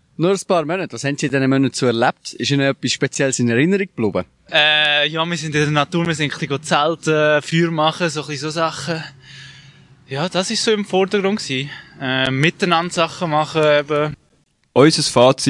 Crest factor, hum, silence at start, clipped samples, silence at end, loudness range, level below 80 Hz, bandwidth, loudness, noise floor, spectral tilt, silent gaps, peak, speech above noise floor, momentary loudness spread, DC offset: 18 dB; none; 0.2 s; under 0.1%; 0 s; 5 LU; -58 dBFS; 11.5 kHz; -17 LUFS; -60 dBFS; -4.5 dB/octave; none; 0 dBFS; 43 dB; 10 LU; under 0.1%